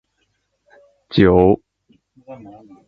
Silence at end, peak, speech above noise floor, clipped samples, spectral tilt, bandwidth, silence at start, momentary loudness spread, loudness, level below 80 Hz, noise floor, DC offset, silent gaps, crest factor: 0.55 s; 0 dBFS; 53 dB; under 0.1%; -9.5 dB/octave; 5.4 kHz; 1.15 s; 27 LU; -15 LUFS; -40 dBFS; -69 dBFS; under 0.1%; none; 20 dB